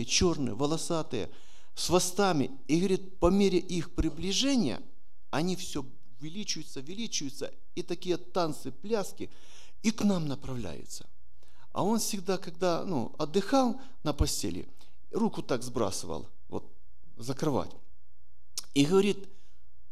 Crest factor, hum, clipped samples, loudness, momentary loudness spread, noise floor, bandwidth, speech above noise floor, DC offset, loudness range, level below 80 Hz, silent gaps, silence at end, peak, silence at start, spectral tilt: 20 dB; none; under 0.1%; -31 LUFS; 16 LU; -65 dBFS; 15.5 kHz; 35 dB; 2%; 7 LU; -46 dBFS; none; 0.65 s; -10 dBFS; 0 s; -4.5 dB/octave